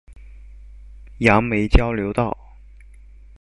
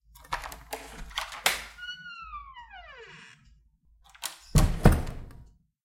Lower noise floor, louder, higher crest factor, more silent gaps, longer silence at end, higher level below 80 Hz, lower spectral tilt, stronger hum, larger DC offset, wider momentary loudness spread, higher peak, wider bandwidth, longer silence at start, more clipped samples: second, -44 dBFS vs -62 dBFS; first, -19 LUFS vs -30 LUFS; second, 20 dB vs 26 dB; neither; first, 1.1 s vs 0.4 s; first, -28 dBFS vs -34 dBFS; first, -7 dB/octave vs -4.5 dB/octave; first, 50 Hz at -35 dBFS vs none; neither; second, 9 LU vs 22 LU; about the same, -2 dBFS vs -4 dBFS; second, 11.5 kHz vs 16.5 kHz; second, 0.1 s vs 0.3 s; neither